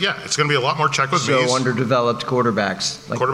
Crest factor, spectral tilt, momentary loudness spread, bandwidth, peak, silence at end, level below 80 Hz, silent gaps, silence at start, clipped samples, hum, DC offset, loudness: 14 dB; -4 dB/octave; 4 LU; 13.5 kHz; -4 dBFS; 0 s; -58 dBFS; none; 0 s; under 0.1%; none; under 0.1%; -19 LUFS